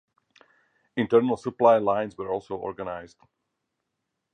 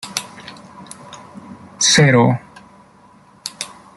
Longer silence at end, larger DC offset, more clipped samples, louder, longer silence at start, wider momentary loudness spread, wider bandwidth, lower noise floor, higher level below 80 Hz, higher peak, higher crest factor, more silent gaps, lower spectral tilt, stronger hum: first, 1.25 s vs 0.3 s; neither; neither; second, -25 LUFS vs -15 LUFS; first, 0.95 s vs 0.05 s; second, 15 LU vs 27 LU; second, 9.4 kHz vs 12 kHz; first, -81 dBFS vs -48 dBFS; second, -64 dBFS vs -56 dBFS; second, -6 dBFS vs 0 dBFS; about the same, 20 dB vs 20 dB; neither; first, -7.5 dB/octave vs -3.5 dB/octave; neither